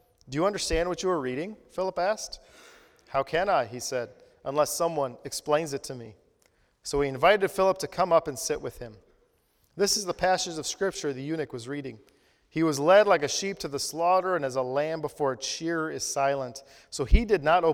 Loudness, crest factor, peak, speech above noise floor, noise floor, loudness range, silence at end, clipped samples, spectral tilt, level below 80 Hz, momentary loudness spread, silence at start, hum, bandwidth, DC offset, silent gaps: -27 LUFS; 22 dB; -6 dBFS; 41 dB; -68 dBFS; 5 LU; 0 s; under 0.1%; -4 dB/octave; -38 dBFS; 14 LU; 0.3 s; none; 18.5 kHz; under 0.1%; none